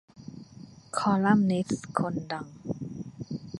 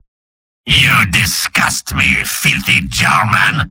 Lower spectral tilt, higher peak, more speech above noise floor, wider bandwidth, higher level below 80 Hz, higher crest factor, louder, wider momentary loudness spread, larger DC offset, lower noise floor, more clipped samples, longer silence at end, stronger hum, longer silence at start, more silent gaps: first, -6.5 dB/octave vs -2.5 dB/octave; second, -8 dBFS vs 0 dBFS; second, 23 dB vs over 76 dB; second, 11.5 kHz vs 17 kHz; second, -62 dBFS vs -32 dBFS; first, 22 dB vs 14 dB; second, -29 LUFS vs -11 LUFS; first, 24 LU vs 4 LU; neither; second, -49 dBFS vs under -90 dBFS; neither; about the same, 0 s vs 0 s; neither; second, 0.15 s vs 0.65 s; neither